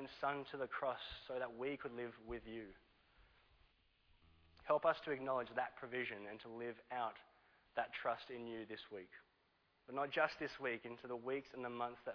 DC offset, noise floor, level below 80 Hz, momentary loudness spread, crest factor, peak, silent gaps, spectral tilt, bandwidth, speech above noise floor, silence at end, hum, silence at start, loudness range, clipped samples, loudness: under 0.1%; -79 dBFS; -74 dBFS; 13 LU; 22 dB; -24 dBFS; none; -2.5 dB/octave; 5.4 kHz; 34 dB; 0 s; none; 0 s; 5 LU; under 0.1%; -44 LUFS